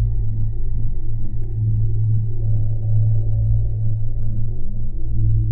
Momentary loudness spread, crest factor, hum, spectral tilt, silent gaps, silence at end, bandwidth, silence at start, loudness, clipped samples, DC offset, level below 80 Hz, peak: 8 LU; 10 dB; none; -14 dB/octave; none; 0 s; 0.8 kHz; 0 s; -23 LUFS; under 0.1%; under 0.1%; -22 dBFS; -6 dBFS